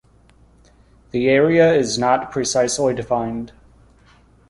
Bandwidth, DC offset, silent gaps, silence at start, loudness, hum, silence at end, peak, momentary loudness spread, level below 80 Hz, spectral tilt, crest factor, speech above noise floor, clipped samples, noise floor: 11.5 kHz; under 0.1%; none; 1.15 s; -18 LUFS; none; 1 s; -2 dBFS; 13 LU; -50 dBFS; -4.5 dB/octave; 18 dB; 35 dB; under 0.1%; -52 dBFS